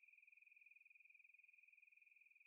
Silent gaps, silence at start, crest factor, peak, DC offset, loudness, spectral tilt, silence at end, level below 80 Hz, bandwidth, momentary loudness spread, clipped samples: none; 0 s; 12 dB; -58 dBFS; under 0.1%; -68 LUFS; 6.5 dB/octave; 0 s; under -90 dBFS; 2.8 kHz; 2 LU; under 0.1%